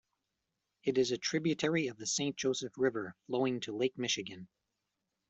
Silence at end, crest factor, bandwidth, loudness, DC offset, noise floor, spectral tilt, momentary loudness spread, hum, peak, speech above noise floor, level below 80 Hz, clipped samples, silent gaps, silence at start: 0.85 s; 18 dB; 8.2 kHz; -34 LUFS; under 0.1%; -86 dBFS; -3.5 dB/octave; 7 LU; none; -18 dBFS; 52 dB; -76 dBFS; under 0.1%; none; 0.85 s